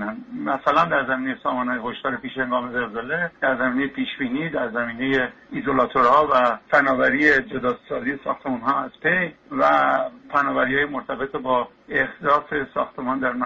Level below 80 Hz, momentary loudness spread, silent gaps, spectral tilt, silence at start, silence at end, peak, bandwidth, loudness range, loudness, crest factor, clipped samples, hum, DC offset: -54 dBFS; 10 LU; none; -3 dB/octave; 0 s; 0 s; -4 dBFS; 7.6 kHz; 5 LU; -22 LUFS; 18 dB; under 0.1%; none; under 0.1%